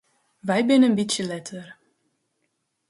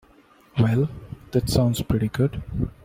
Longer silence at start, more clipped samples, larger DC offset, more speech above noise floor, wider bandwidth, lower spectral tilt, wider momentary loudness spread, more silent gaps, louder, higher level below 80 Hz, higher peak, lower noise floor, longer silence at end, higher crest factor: about the same, 0.45 s vs 0.55 s; neither; neither; first, 54 dB vs 32 dB; second, 11.5 kHz vs 16 kHz; second, -4.5 dB/octave vs -7 dB/octave; first, 19 LU vs 8 LU; neither; first, -21 LUFS vs -24 LUFS; second, -70 dBFS vs -40 dBFS; about the same, -8 dBFS vs -6 dBFS; first, -75 dBFS vs -55 dBFS; first, 1.15 s vs 0.15 s; about the same, 16 dB vs 18 dB